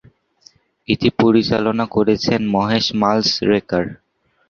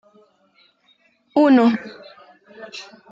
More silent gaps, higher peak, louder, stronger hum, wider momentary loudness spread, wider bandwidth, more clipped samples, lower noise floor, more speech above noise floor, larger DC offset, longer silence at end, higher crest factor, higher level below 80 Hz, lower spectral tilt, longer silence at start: neither; first, 0 dBFS vs -4 dBFS; about the same, -17 LUFS vs -17 LUFS; neither; second, 7 LU vs 24 LU; about the same, 7 kHz vs 7.4 kHz; neither; second, -52 dBFS vs -60 dBFS; second, 35 dB vs 43 dB; neither; first, 0.55 s vs 0.3 s; about the same, 18 dB vs 18 dB; first, -48 dBFS vs -72 dBFS; about the same, -5.5 dB/octave vs -6 dB/octave; second, 0.9 s vs 1.35 s